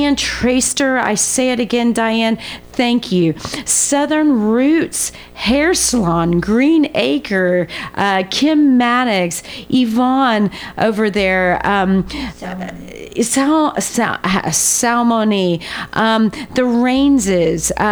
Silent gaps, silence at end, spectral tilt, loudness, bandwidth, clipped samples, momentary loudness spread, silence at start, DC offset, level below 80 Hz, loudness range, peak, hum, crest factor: none; 0 s; -3.5 dB/octave; -15 LUFS; over 20 kHz; under 0.1%; 8 LU; 0 s; under 0.1%; -40 dBFS; 2 LU; -2 dBFS; none; 14 dB